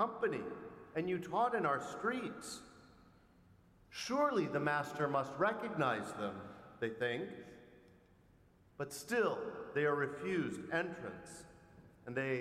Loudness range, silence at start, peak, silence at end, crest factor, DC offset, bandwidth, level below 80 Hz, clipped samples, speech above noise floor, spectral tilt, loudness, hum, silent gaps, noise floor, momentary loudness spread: 5 LU; 0 s; -22 dBFS; 0 s; 18 dB; under 0.1%; 15.5 kHz; -74 dBFS; under 0.1%; 29 dB; -5 dB/octave; -38 LUFS; none; none; -67 dBFS; 16 LU